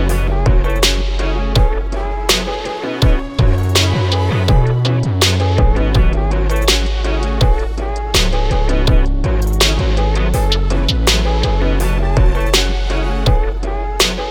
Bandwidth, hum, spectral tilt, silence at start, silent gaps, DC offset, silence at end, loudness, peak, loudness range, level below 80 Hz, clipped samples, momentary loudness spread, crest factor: 17.5 kHz; none; -4.5 dB/octave; 0 s; none; under 0.1%; 0 s; -16 LUFS; -2 dBFS; 2 LU; -16 dBFS; under 0.1%; 5 LU; 12 dB